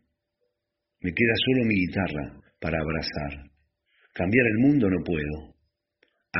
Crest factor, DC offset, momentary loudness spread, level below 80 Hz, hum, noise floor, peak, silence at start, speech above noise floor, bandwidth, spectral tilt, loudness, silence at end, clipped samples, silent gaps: 20 dB; under 0.1%; 15 LU; -46 dBFS; none; -82 dBFS; -6 dBFS; 1.05 s; 58 dB; 5.8 kHz; -5 dB/octave; -25 LUFS; 0 s; under 0.1%; none